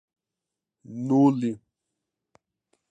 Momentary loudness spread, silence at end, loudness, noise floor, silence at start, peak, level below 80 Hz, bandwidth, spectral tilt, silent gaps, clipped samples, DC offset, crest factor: 21 LU; 1.35 s; -23 LUFS; -87 dBFS; 0.9 s; -10 dBFS; -76 dBFS; 8 kHz; -9 dB/octave; none; under 0.1%; under 0.1%; 20 dB